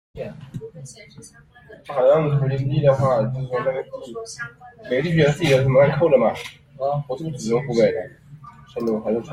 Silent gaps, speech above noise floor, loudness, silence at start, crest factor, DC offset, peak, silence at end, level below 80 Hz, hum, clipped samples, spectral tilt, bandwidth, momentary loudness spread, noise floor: none; 23 dB; -20 LUFS; 0.15 s; 18 dB; under 0.1%; -4 dBFS; 0 s; -52 dBFS; none; under 0.1%; -7 dB/octave; 13 kHz; 20 LU; -43 dBFS